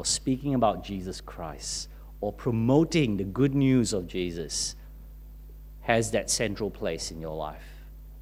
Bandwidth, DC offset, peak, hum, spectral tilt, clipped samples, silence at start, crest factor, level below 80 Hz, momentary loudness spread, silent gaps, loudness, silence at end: 16 kHz; under 0.1%; -6 dBFS; 50 Hz at -45 dBFS; -4.5 dB/octave; under 0.1%; 0 s; 22 dB; -44 dBFS; 25 LU; none; -28 LUFS; 0 s